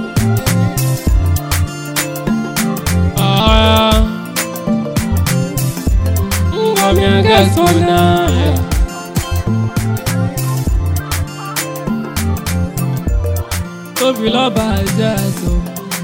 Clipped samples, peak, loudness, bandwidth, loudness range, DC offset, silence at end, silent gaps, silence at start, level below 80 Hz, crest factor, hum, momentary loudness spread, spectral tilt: under 0.1%; 0 dBFS; -15 LUFS; 17.5 kHz; 6 LU; under 0.1%; 0 s; none; 0 s; -22 dBFS; 14 dB; none; 9 LU; -5 dB/octave